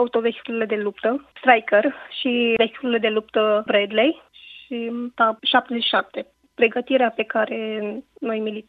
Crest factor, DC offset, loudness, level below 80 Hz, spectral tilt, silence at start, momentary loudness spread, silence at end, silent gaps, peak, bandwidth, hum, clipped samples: 20 dB; under 0.1%; -21 LUFS; -68 dBFS; -6.5 dB/octave; 0 s; 12 LU; 0.05 s; none; 0 dBFS; 4.9 kHz; none; under 0.1%